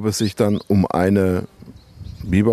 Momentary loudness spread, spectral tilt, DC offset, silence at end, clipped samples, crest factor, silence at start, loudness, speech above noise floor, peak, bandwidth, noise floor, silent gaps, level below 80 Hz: 21 LU; -6.5 dB/octave; under 0.1%; 0 s; under 0.1%; 16 dB; 0 s; -19 LUFS; 22 dB; -4 dBFS; 14 kHz; -40 dBFS; none; -44 dBFS